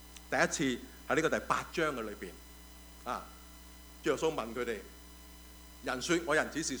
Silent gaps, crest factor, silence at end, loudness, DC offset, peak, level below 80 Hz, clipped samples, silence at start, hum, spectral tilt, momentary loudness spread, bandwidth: none; 22 dB; 0 s; -34 LUFS; under 0.1%; -12 dBFS; -56 dBFS; under 0.1%; 0 s; none; -3.5 dB/octave; 21 LU; over 20 kHz